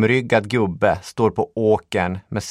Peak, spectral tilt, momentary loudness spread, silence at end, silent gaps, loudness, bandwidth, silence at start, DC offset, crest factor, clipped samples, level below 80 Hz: -2 dBFS; -6 dB/octave; 5 LU; 0 s; none; -20 LUFS; 13 kHz; 0 s; under 0.1%; 18 dB; under 0.1%; -48 dBFS